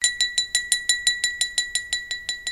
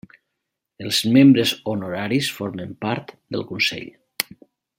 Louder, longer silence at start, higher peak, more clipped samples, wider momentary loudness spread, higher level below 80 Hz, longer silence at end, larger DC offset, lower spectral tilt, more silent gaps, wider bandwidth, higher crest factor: about the same, -22 LUFS vs -20 LUFS; second, 0 s vs 0.8 s; about the same, 0 dBFS vs 0 dBFS; neither; second, 7 LU vs 17 LU; first, -54 dBFS vs -62 dBFS; second, 0 s vs 0.55 s; neither; second, 3.5 dB/octave vs -4.5 dB/octave; neither; about the same, 16 kHz vs 16.5 kHz; about the same, 24 dB vs 22 dB